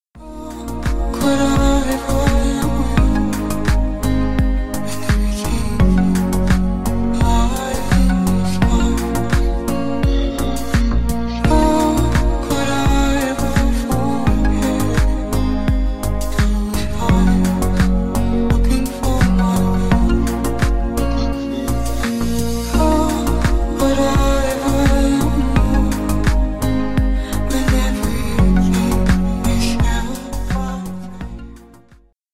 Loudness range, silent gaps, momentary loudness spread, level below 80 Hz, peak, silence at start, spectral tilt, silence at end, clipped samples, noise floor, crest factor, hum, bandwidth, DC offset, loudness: 2 LU; none; 6 LU; -20 dBFS; -2 dBFS; 0 s; -6 dB/octave; 0 s; under 0.1%; -50 dBFS; 14 dB; none; 16 kHz; 4%; -18 LUFS